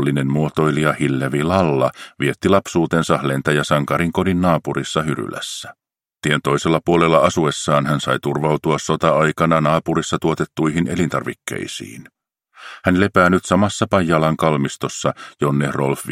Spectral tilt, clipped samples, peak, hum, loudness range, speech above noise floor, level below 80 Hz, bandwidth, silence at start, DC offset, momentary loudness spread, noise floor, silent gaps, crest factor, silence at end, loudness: -5.5 dB/octave; under 0.1%; 0 dBFS; none; 3 LU; 31 dB; -48 dBFS; 16 kHz; 0 s; under 0.1%; 9 LU; -49 dBFS; none; 18 dB; 0 s; -18 LUFS